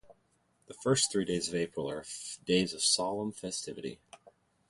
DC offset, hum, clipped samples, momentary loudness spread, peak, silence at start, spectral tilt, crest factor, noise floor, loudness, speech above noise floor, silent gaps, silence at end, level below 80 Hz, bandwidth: under 0.1%; none; under 0.1%; 13 LU; -14 dBFS; 0.05 s; -3 dB/octave; 20 dB; -72 dBFS; -32 LUFS; 40 dB; none; 0.4 s; -64 dBFS; 11.5 kHz